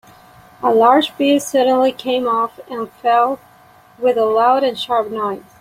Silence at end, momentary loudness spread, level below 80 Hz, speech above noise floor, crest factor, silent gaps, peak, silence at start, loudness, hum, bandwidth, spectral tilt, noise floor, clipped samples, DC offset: 0.2 s; 10 LU; -62 dBFS; 31 dB; 16 dB; none; -2 dBFS; 0.6 s; -16 LUFS; none; 16 kHz; -4 dB/octave; -47 dBFS; under 0.1%; under 0.1%